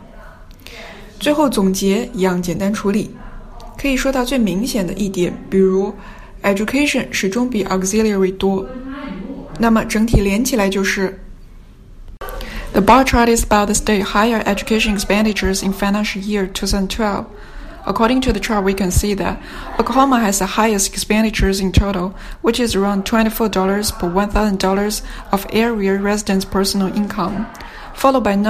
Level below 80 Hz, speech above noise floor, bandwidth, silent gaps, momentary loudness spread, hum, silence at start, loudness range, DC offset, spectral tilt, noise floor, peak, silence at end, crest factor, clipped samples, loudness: -30 dBFS; 23 dB; 15.5 kHz; none; 14 LU; none; 0 s; 3 LU; under 0.1%; -4.5 dB/octave; -39 dBFS; 0 dBFS; 0 s; 16 dB; under 0.1%; -17 LUFS